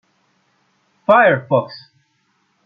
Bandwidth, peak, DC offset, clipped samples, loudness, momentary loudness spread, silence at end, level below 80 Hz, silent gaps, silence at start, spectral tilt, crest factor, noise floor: 5.4 kHz; -2 dBFS; under 0.1%; under 0.1%; -15 LUFS; 21 LU; 0.85 s; -66 dBFS; none; 1.1 s; -8 dB/octave; 18 dB; -64 dBFS